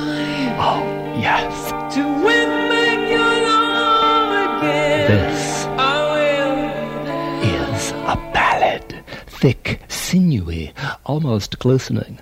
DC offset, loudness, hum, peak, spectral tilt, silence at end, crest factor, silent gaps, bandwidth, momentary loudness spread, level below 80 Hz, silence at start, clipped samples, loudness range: under 0.1%; -18 LUFS; none; -2 dBFS; -5 dB/octave; 0.05 s; 16 dB; none; 16 kHz; 9 LU; -40 dBFS; 0 s; under 0.1%; 4 LU